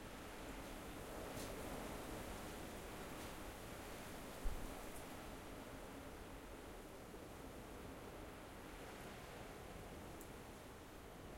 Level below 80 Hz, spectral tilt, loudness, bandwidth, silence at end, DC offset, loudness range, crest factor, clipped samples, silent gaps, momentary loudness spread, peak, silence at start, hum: -58 dBFS; -4.5 dB/octave; -53 LUFS; 16.5 kHz; 0 s; under 0.1%; 4 LU; 22 dB; under 0.1%; none; 6 LU; -30 dBFS; 0 s; none